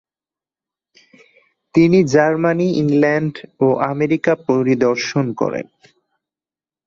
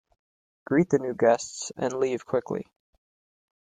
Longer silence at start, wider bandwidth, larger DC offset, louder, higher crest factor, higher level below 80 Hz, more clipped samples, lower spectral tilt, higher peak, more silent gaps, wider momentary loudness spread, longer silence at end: first, 1.75 s vs 0.7 s; second, 7.6 kHz vs 9.6 kHz; neither; first, -16 LUFS vs -26 LUFS; about the same, 16 dB vs 18 dB; first, -56 dBFS vs -68 dBFS; neither; first, -7 dB/octave vs -5.5 dB/octave; first, -2 dBFS vs -10 dBFS; neither; second, 8 LU vs 11 LU; first, 1.25 s vs 1 s